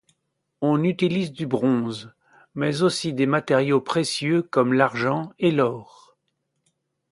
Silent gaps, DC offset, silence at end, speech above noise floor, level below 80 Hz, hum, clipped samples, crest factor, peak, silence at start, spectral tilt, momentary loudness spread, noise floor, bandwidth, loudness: none; under 0.1%; 1.3 s; 54 dB; -66 dBFS; none; under 0.1%; 22 dB; -2 dBFS; 0.6 s; -6 dB/octave; 7 LU; -75 dBFS; 11.5 kHz; -22 LUFS